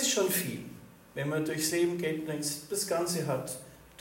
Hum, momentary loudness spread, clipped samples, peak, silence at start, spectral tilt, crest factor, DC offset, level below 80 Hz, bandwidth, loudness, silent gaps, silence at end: none; 15 LU; under 0.1%; -16 dBFS; 0 s; -3.5 dB/octave; 16 dB; under 0.1%; -66 dBFS; 16.5 kHz; -31 LUFS; none; 0.05 s